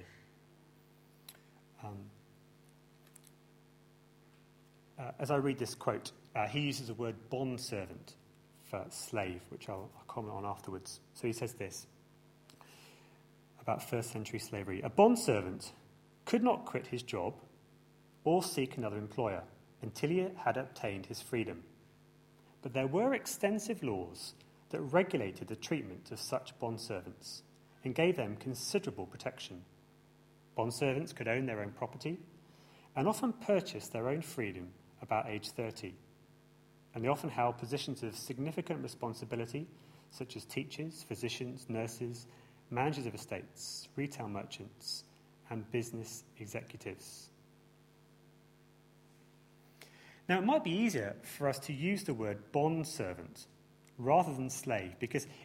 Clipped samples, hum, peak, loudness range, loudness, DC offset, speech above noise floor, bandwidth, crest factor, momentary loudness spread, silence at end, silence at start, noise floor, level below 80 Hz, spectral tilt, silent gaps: under 0.1%; none; -12 dBFS; 10 LU; -37 LUFS; under 0.1%; 27 dB; 16.5 kHz; 26 dB; 17 LU; 0 s; 0 s; -64 dBFS; -72 dBFS; -5 dB/octave; none